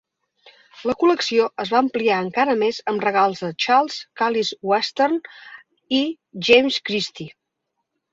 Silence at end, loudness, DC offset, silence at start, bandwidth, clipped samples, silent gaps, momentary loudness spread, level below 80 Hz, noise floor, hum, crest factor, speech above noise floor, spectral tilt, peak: 0.85 s; -20 LUFS; under 0.1%; 0.75 s; 7.8 kHz; under 0.1%; none; 11 LU; -64 dBFS; -77 dBFS; none; 20 dB; 57 dB; -4 dB/octave; -2 dBFS